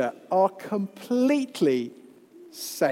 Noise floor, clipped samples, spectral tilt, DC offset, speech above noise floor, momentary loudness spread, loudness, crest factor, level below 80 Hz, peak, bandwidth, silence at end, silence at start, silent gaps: -50 dBFS; under 0.1%; -5 dB/octave; under 0.1%; 25 dB; 13 LU; -25 LUFS; 16 dB; -82 dBFS; -10 dBFS; 16.5 kHz; 0 s; 0 s; none